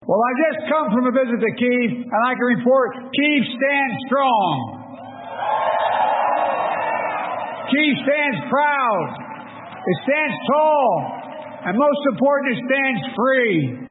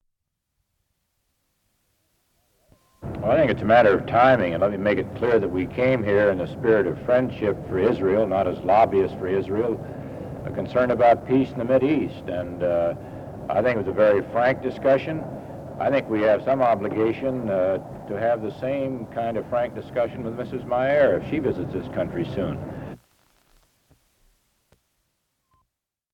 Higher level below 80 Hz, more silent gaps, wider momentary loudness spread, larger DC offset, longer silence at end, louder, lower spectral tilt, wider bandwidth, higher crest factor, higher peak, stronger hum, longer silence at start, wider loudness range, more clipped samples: second, -70 dBFS vs -50 dBFS; neither; about the same, 12 LU vs 13 LU; neither; second, 0 s vs 3.15 s; first, -19 LUFS vs -22 LUFS; first, -10.5 dB/octave vs -8 dB/octave; second, 4.1 kHz vs 9.4 kHz; second, 12 dB vs 18 dB; about the same, -6 dBFS vs -6 dBFS; neither; second, 0 s vs 3 s; second, 2 LU vs 6 LU; neither